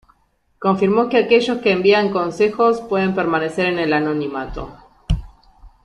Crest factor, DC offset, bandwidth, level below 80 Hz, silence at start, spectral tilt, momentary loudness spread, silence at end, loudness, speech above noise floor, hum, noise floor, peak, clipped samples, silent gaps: 16 dB; under 0.1%; 11 kHz; -36 dBFS; 0.6 s; -6.5 dB/octave; 11 LU; 0.15 s; -18 LUFS; 45 dB; none; -62 dBFS; -2 dBFS; under 0.1%; none